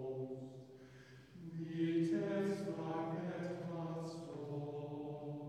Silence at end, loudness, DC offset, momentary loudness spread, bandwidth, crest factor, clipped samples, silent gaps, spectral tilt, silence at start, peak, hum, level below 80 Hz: 0 s; -42 LUFS; under 0.1%; 19 LU; 11 kHz; 14 dB; under 0.1%; none; -8 dB/octave; 0 s; -28 dBFS; none; -80 dBFS